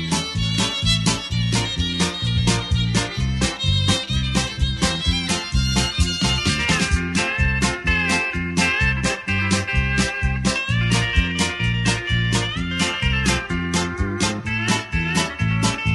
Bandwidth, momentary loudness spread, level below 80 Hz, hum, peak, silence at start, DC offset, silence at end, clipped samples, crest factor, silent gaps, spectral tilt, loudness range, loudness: 11.5 kHz; 3 LU; -28 dBFS; none; -4 dBFS; 0 s; under 0.1%; 0 s; under 0.1%; 16 dB; none; -4 dB/octave; 2 LU; -20 LUFS